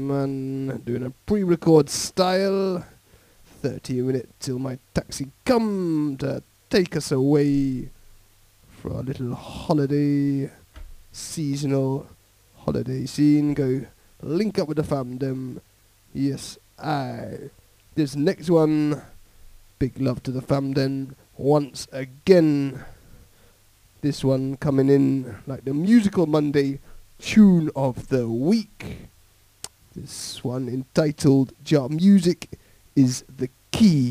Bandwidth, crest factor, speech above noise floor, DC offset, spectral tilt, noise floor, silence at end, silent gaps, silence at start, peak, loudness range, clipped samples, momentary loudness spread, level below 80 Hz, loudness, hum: 16 kHz; 22 dB; 34 dB; under 0.1%; -6.5 dB/octave; -56 dBFS; 0 s; none; 0 s; -2 dBFS; 7 LU; under 0.1%; 16 LU; -50 dBFS; -23 LUFS; none